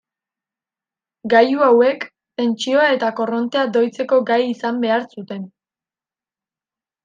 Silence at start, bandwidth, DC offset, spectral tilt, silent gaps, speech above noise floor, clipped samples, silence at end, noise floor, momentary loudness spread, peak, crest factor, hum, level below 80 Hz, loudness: 1.25 s; 9 kHz; under 0.1%; -5 dB/octave; none; over 73 dB; under 0.1%; 1.6 s; under -90 dBFS; 17 LU; -2 dBFS; 16 dB; none; -72 dBFS; -17 LUFS